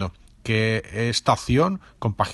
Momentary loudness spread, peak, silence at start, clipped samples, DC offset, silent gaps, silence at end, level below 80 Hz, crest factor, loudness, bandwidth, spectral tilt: 9 LU; -4 dBFS; 0 s; under 0.1%; under 0.1%; none; 0 s; -44 dBFS; 20 dB; -23 LUFS; 12 kHz; -5.5 dB/octave